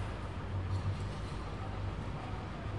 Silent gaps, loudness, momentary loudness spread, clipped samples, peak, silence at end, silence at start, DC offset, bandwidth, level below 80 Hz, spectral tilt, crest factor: none; -40 LUFS; 5 LU; under 0.1%; -26 dBFS; 0 s; 0 s; 0.2%; 11 kHz; -46 dBFS; -7 dB/octave; 14 dB